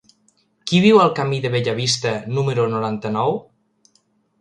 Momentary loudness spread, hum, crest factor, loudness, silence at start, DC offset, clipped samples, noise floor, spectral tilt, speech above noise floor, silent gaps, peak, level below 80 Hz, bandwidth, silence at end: 10 LU; none; 18 dB; -18 LUFS; 0.65 s; under 0.1%; under 0.1%; -63 dBFS; -5.5 dB/octave; 45 dB; none; -2 dBFS; -60 dBFS; 11 kHz; 1 s